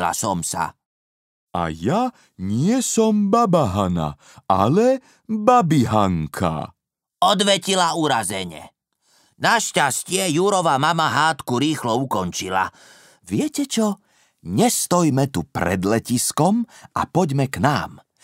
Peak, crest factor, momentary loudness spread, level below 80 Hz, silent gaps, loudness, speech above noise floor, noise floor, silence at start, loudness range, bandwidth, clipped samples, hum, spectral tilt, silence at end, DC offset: -2 dBFS; 20 dB; 10 LU; -50 dBFS; 0.86-1.47 s; -20 LUFS; 42 dB; -62 dBFS; 0 s; 3 LU; 16 kHz; under 0.1%; none; -4.5 dB/octave; 0.25 s; under 0.1%